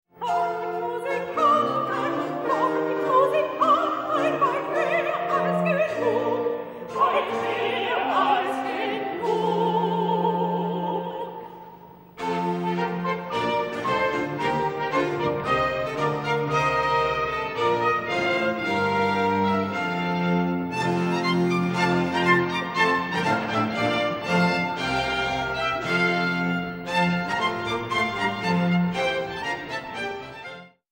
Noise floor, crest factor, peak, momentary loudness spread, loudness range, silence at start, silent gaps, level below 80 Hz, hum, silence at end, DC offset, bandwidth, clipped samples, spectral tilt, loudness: -46 dBFS; 16 dB; -8 dBFS; 7 LU; 4 LU; 0.2 s; none; -56 dBFS; none; 0.25 s; under 0.1%; 16 kHz; under 0.1%; -6 dB/octave; -24 LUFS